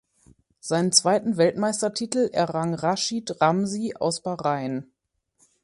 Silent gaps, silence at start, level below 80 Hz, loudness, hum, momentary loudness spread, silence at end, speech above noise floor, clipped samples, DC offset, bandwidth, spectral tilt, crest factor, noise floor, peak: none; 0.65 s; -66 dBFS; -24 LUFS; none; 9 LU; 0.8 s; 45 dB; under 0.1%; under 0.1%; 12 kHz; -4 dB/octave; 22 dB; -68 dBFS; -2 dBFS